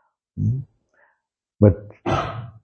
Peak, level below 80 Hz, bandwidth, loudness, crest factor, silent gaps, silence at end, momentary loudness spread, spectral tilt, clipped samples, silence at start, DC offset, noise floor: 0 dBFS; -44 dBFS; 6.6 kHz; -22 LUFS; 22 dB; none; 0.15 s; 13 LU; -8.5 dB/octave; under 0.1%; 0.35 s; under 0.1%; -73 dBFS